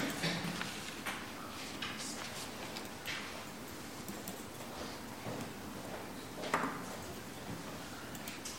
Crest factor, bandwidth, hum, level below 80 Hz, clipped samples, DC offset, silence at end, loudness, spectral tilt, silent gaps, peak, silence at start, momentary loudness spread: 26 dB; 16.5 kHz; none; -64 dBFS; under 0.1%; 0.1%; 0 s; -42 LUFS; -3.5 dB/octave; none; -18 dBFS; 0 s; 9 LU